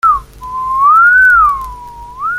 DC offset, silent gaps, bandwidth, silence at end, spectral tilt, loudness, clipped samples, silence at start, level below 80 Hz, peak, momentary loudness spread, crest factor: under 0.1%; none; 16 kHz; 0 s; -3 dB/octave; -8 LUFS; under 0.1%; 0.05 s; -34 dBFS; -2 dBFS; 20 LU; 10 dB